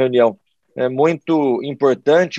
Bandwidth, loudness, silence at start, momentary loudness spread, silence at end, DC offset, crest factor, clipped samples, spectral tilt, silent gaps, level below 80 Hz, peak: 8 kHz; -17 LUFS; 0 s; 7 LU; 0 s; under 0.1%; 14 dB; under 0.1%; -6.5 dB/octave; none; -70 dBFS; -2 dBFS